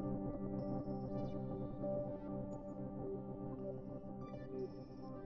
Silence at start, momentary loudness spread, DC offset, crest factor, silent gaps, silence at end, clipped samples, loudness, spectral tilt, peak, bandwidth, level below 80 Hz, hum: 0 s; 7 LU; under 0.1%; 14 dB; none; 0 s; under 0.1%; -45 LUFS; -10.5 dB/octave; -30 dBFS; 7 kHz; -58 dBFS; none